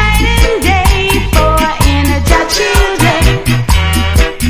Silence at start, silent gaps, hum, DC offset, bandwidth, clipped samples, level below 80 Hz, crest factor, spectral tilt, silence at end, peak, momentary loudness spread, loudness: 0 s; none; none; under 0.1%; 16 kHz; 0.4%; -12 dBFS; 10 dB; -4.5 dB/octave; 0 s; 0 dBFS; 2 LU; -10 LUFS